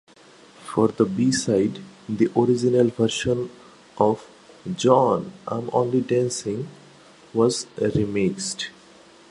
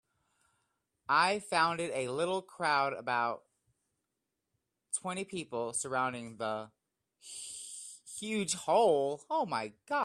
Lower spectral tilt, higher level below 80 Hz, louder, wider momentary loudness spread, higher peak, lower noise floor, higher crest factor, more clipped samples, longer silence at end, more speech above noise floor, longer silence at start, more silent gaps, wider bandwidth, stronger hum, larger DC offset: first, -5.5 dB/octave vs -3 dB/octave; first, -54 dBFS vs -78 dBFS; first, -22 LUFS vs -33 LUFS; about the same, 13 LU vs 15 LU; first, -2 dBFS vs -14 dBFS; second, -50 dBFS vs -86 dBFS; about the same, 20 dB vs 22 dB; neither; first, 0.6 s vs 0 s; second, 29 dB vs 54 dB; second, 0.6 s vs 1.1 s; neither; second, 11.5 kHz vs 14.5 kHz; neither; neither